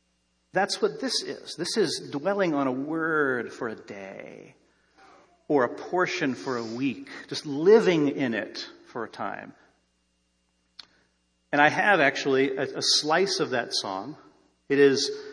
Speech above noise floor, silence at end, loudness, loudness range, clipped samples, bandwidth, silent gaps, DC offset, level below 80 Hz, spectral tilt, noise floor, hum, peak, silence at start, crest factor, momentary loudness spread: 46 dB; 0 s; -25 LUFS; 7 LU; under 0.1%; 10.5 kHz; none; under 0.1%; -76 dBFS; -3.5 dB/octave; -72 dBFS; none; -6 dBFS; 0.55 s; 22 dB; 17 LU